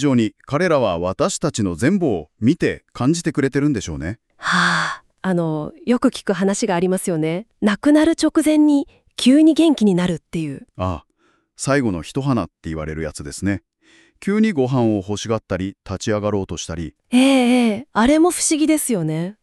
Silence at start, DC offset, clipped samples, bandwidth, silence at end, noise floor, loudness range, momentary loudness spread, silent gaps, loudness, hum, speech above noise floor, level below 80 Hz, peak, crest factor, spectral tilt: 0 s; under 0.1%; under 0.1%; 13.5 kHz; 0.1 s; -62 dBFS; 6 LU; 12 LU; none; -19 LUFS; none; 44 dB; -46 dBFS; -2 dBFS; 16 dB; -5 dB/octave